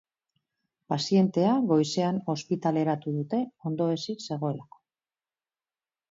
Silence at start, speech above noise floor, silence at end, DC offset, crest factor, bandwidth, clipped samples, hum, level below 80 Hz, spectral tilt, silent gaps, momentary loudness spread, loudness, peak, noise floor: 0.9 s; over 63 dB; 1.5 s; under 0.1%; 16 dB; 7.8 kHz; under 0.1%; none; -74 dBFS; -6.5 dB/octave; none; 9 LU; -27 LUFS; -12 dBFS; under -90 dBFS